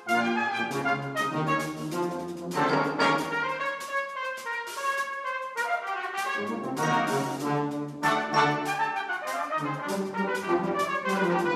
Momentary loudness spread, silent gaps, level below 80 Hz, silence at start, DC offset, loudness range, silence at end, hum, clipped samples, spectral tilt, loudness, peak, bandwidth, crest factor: 7 LU; none; -72 dBFS; 0 s; under 0.1%; 3 LU; 0 s; none; under 0.1%; -4.5 dB/octave; -28 LUFS; -12 dBFS; 14.5 kHz; 18 dB